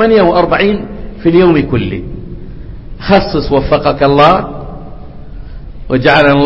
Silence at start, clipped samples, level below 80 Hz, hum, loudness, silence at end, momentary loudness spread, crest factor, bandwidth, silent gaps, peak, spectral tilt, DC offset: 0 s; 0.2%; -28 dBFS; none; -10 LUFS; 0 s; 23 LU; 10 dB; 8 kHz; none; 0 dBFS; -8.5 dB/octave; under 0.1%